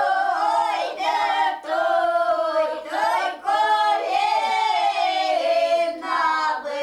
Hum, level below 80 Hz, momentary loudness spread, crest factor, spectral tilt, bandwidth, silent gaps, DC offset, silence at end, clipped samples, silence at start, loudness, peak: none; -66 dBFS; 4 LU; 12 dB; -1 dB/octave; 12.5 kHz; none; under 0.1%; 0 s; under 0.1%; 0 s; -21 LUFS; -10 dBFS